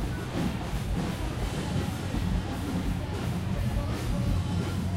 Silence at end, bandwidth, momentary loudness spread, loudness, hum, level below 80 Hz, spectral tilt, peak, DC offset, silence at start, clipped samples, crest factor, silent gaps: 0 s; 16 kHz; 3 LU; -31 LUFS; none; -36 dBFS; -6.5 dB/octave; -16 dBFS; under 0.1%; 0 s; under 0.1%; 14 dB; none